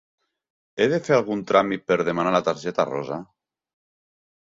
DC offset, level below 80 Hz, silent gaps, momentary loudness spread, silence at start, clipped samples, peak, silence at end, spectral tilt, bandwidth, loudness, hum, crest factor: under 0.1%; -64 dBFS; none; 10 LU; 0.75 s; under 0.1%; -4 dBFS; 1.3 s; -5.5 dB/octave; 7.8 kHz; -22 LUFS; none; 22 dB